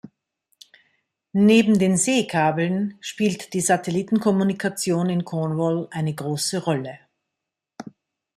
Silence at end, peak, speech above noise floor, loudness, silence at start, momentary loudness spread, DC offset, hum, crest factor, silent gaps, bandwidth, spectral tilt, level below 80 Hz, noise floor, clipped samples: 0.45 s; -4 dBFS; 63 dB; -21 LUFS; 0.05 s; 11 LU; under 0.1%; none; 18 dB; none; 14 kHz; -5 dB/octave; -64 dBFS; -84 dBFS; under 0.1%